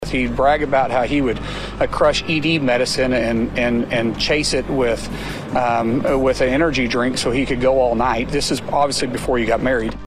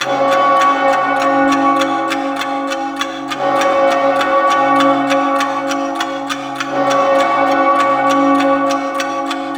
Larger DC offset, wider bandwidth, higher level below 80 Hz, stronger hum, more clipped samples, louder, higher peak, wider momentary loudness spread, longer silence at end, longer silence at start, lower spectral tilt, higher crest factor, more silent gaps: neither; second, 15 kHz vs over 20 kHz; first, -34 dBFS vs -58 dBFS; neither; neither; second, -18 LUFS vs -14 LUFS; about the same, -2 dBFS vs 0 dBFS; second, 5 LU vs 8 LU; about the same, 0 s vs 0 s; about the same, 0 s vs 0 s; about the same, -4.5 dB/octave vs -3.5 dB/octave; about the same, 16 dB vs 14 dB; neither